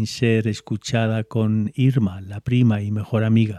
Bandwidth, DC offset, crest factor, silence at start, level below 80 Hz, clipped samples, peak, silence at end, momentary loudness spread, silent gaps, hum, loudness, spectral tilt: 10.5 kHz; under 0.1%; 16 dB; 0 s; -56 dBFS; under 0.1%; -4 dBFS; 0 s; 7 LU; none; none; -21 LUFS; -7 dB/octave